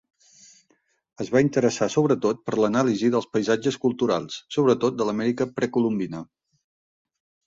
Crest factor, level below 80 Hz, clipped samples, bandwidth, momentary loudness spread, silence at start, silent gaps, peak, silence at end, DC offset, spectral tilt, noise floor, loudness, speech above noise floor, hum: 18 dB; -64 dBFS; under 0.1%; 7.8 kHz; 6 LU; 1.2 s; none; -6 dBFS; 1.2 s; under 0.1%; -6 dB/octave; -67 dBFS; -23 LUFS; 45 dB; none